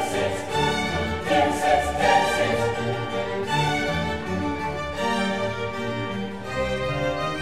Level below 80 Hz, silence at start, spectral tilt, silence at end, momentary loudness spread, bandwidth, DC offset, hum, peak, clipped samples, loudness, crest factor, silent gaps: -42 dBFS; 0 s; -4.5 dB/octave; 0 s; 8 LU; 16 kHz; 0.7%; none; -8 dBFS; under 0.1%; -24 LUFS; 16 dB; none